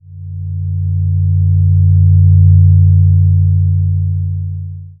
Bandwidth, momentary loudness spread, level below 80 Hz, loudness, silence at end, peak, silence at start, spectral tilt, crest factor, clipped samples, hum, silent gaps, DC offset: 0.5 kHz; 15 LU; -30 dBFS; -11 LUFS; 0.1 s; 0 dBFS; 0.1 s; -20.5 dB/octave; 10 dB; under 0.1%; none; none; under 0.1%